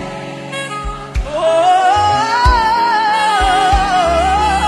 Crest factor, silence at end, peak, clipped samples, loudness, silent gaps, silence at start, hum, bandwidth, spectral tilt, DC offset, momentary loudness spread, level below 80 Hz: 14 dB; 0 s; 0 dBFS; under 0.1%; -13 LUFS; none; 0 s; none; 12.5 kHz; -4 dB/octave; under 0.1%; 12 LU; -24 dBFS